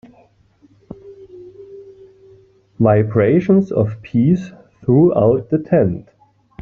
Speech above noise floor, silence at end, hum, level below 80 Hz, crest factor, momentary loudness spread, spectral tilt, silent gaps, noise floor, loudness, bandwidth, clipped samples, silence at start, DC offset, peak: 39 dB; 0.6 s; none; -50 dBFS; 16 dB; 23 LU; -10 dB/octave; none; -53 dBFS; -15 LUFS; 6.6 kHz; under 0.1%; 0.9 s; under 0.1%; -2 dBFS